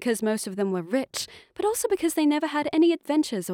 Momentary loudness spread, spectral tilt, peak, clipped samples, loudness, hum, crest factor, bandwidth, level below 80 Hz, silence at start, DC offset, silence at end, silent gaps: 7 LU; -4 dB/octave; -12 dBFS; under 0.1%; -25 LUFS; none; 14 dB; 18 kHz; -66 dBFS; 0 s; under 0.1%; 0 s; none